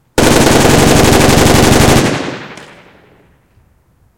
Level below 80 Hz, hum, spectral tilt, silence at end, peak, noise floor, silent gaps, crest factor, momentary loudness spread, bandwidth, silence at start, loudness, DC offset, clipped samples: -22 dBFS; none; -4.5 dB/octave; 0 s; 0 dBFS; -51 dBFS; none; 10 dB; 14 LU; over 20 kHz; 0 s; -8 LUFS; under 0.1%; 1%